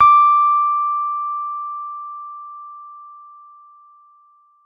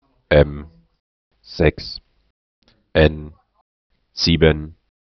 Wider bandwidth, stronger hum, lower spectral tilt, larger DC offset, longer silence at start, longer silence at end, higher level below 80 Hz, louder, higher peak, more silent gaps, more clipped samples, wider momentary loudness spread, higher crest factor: second, 5 kHz vs 6.4 kHz; first, 50 Hz at -100 dBFS vs none; second, -2 dB/octave vs -5 dB/octave; neither; second, 0 s vs 0.3 s; first, 1.45 s vs 0.45 s; second, -66 dBFS vs -32 dBFS; about the same, -17 LUFS vs -18 LUFS; second, -4 dBFS vs 0 dBFS; second, none vs 1.00-1.31 s, 2.30-2.62 s, 3.61-3.90 s; neither; first, 25 LU vs 20 LU; about the same, 16 dB vs 20 dB